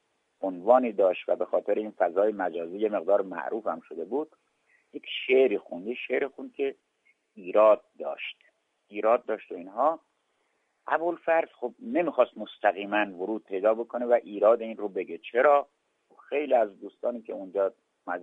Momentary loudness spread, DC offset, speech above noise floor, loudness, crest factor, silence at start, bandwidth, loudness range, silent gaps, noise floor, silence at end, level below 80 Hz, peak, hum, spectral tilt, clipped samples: 14 LU; under 0.1%; 47 dB; -27 LUFS; 22 dB; 0.4 s; 3.9 kHz; 4 LU; none; -74 dBFS; 0 s; -82 dBFS; -6 dBFS; none; -6.5 dB/octave; under 0.1%